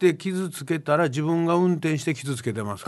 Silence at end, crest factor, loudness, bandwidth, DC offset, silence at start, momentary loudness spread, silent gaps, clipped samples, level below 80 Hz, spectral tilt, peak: 0 s; 16 dB; -24 LUFS; 12.5 kHz; under 0.1%; 0 s; 7 LU; none; under 0.1%; -62 dBFS; -6.5 dB/octave; -8 dBFS